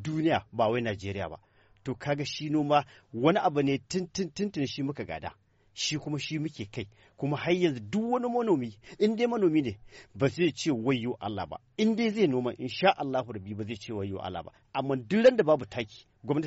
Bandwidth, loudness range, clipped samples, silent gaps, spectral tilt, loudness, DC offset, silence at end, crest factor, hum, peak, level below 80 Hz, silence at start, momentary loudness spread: 8 kHz; 4 LU; under 0.1%; none; -5 dB/octave; -29 LUFS; under 0.1%; 0 s; 20 dB; none; -10 dBFS; -62 dBFS; 0 s; 13 LU